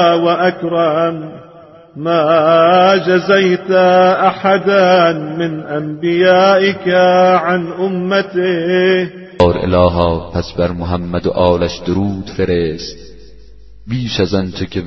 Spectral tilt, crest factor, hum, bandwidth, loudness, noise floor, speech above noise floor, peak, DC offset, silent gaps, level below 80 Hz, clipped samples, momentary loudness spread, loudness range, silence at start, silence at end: -6.5 dB/octave; 12 dB; none; 6.2 kHz; -13 LUFS; -40 dBFS; 27 dB; 0 dBFS; under 0.1%; none; -38 dBFS; under 0.1%; 11 LU; 7 LU; 0 s; 0 s